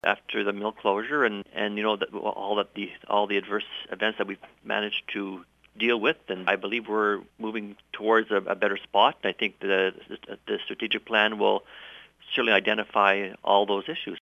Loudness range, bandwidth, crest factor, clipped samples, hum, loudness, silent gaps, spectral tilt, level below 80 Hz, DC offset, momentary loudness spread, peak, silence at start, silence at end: 4 LU; 11 kHz; 22 dB; under 0.1%; none; -26 LUFS; none; -5.5 dB/octave; -70 dBFS; under 0.1%; 12 LU; -4 dBFS; 0.05 s; 0 s